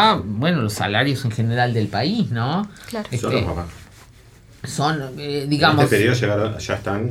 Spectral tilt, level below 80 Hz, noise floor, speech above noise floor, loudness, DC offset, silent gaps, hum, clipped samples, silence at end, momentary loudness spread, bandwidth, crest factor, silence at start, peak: -5.5 dB/octave; -46 dBFS; -47 dBFS; 27 dB; -20 LUFS; under 0.1%; none; none; under 0.1%; 0 s; 11 LU; 16 kHz; 18 dB; 0 s; -2 dBFS